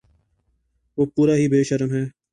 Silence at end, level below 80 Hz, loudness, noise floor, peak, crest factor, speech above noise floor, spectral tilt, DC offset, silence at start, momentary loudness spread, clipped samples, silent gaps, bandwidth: 0.25 s; -58 dBFS; -20 LUFS; -68 dBFS; -8 dBFS; 14 dB; 49 dB; -7.5 dB/octave; under 0.1%; 0.95 s; 9 LU; under 0.1%; none; 11 kHz